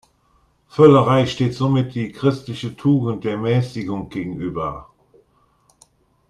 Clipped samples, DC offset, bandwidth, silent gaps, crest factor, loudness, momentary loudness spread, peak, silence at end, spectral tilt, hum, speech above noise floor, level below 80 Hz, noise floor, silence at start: under 0.1%; under 0.1%; 10.5 kHz; none; 20 dB; -19 LUFS; 15 LU; 0 dBFS; 1.45 s; -8 dB/octave; none; 42 dB; -52 dBFS; -60 dBFS; 0.75 s